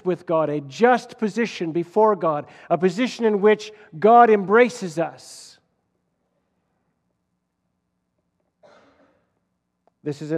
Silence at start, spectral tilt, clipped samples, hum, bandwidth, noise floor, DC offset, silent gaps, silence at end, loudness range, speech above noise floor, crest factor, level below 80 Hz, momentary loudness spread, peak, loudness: 0.05 s; -6 dB/octave; under 0.1%; 60 Hz at -50 dBFS; 11.5 kHz; -75 dBFS; under 0.1%; none; 0 s; 16 LU; 55 dB; 20 dB; -80 dBFS; 16 LU; -2 dBFS; -20 LUFS